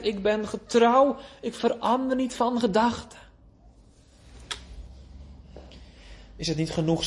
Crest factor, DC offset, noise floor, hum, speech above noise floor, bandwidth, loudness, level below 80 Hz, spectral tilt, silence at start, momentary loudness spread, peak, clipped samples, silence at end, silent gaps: 18 dB; under 0.1%; -55 dBFS; none; 30 dB; 11.5 kHz; -25 LUFS; -50 dBFS; -5.5 dB/octave; 0 s; 26 LU; -8 dBFS; under 0.1%; 0 s; none